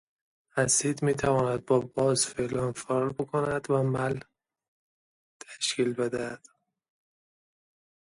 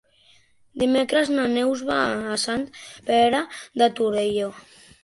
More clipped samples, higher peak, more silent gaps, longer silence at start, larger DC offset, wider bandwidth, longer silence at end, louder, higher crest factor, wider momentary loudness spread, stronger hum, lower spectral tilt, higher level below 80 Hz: neither; second, -10 dBFS vs -6 dBFS; first, 4.68-5.40 s vs none; second, 0.55 s vs 0.75 s; neither; about the same, 11.5 kHz vs 11.5 kHz; first, 1.65 s vs 0.45 s; second, -28 LUFS vs -22 LUFS; about the same, 20 dB vs 18 dB; about the same, 10 LU vs 12 LU; neither; about the same, -4 dB/octave vs -3.5 dB/octave; about the same, -60 dBFS vs -58 dBFS